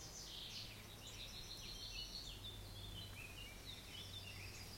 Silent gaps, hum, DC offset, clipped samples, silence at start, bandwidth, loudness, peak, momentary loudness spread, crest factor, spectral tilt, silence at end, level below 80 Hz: none; none; under 0.1%; under 0.1%; 0 s; 16.5 kHz; -51 LUFS; -36 dBFS; 4 LU; 16 dB; -2.5 dB/octave; 0 s; -60 dBFS